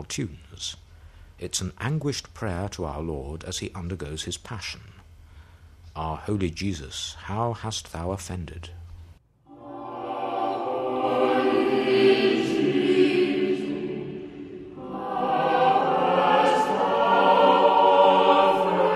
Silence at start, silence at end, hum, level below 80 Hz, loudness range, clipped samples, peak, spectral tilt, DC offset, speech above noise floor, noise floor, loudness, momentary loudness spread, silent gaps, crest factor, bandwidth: 0 s; 0 s; none; -48 dBFS; 13 LU; under 0.1%; -6 dBFS; -5 dB/octave; under 0.1%; 20 dB; -51 dBFS; -23 LUFS; 19 LU; none; 18 dB; 13 kHz